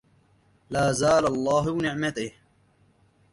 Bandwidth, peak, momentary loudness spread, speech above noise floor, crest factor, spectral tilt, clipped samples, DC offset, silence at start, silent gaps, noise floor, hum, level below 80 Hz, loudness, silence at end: 11.5 kHz; -10 dBFS; 11 LU; 39 dB; 16 dB; -5 dB/octave; under 0.1%; under 0.1%; 0.7 s; none; -62 dBFS; none; -54 dBFS; -24 LUFS; 1 s